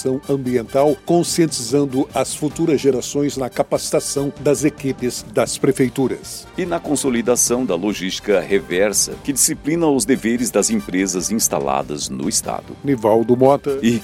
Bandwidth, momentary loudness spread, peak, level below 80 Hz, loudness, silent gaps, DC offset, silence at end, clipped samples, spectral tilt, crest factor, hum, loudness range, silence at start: 16.5 kHz; 7 LU; 0 dBFS; -46 dBFS; -18 LUFS; none; under 0.1%; 0 s; under 0.1%; -4 dB/octave; 18 dB; none; 2 LU; 0 s